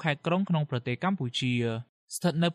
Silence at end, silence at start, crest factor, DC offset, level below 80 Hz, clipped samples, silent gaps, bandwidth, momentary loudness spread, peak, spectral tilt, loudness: 0 s; 0 s; 16 dB; under 0.1%; -66 dBFS; under 0.1%; 1.89-2.08 s; 15 kHz; 6 LU; -12 dBFS; -5.5 dB/octave; -30 LUFS